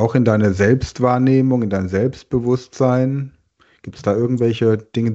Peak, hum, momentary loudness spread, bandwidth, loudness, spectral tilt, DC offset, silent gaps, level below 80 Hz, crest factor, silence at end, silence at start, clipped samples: -2 dBFS; none; 7 LU; 8 kHz; -17 LUFS; -8 dB/octave; under 0.1%; none; -44 dBFS; 16 dB; 0 s; 0 s; under 0.1%